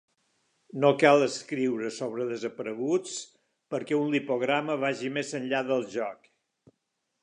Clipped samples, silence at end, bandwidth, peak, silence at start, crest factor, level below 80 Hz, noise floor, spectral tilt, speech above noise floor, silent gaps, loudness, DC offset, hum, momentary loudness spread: under 0.1%; 1.1 s; 10.5 kHz; -6 dBFS; 0.75 s; 22 dB; -82 dBFS; -80 dBFS; -5 dB/octave; 53 dB; none; -28 LUFS; under 0.1%; none; 14 LU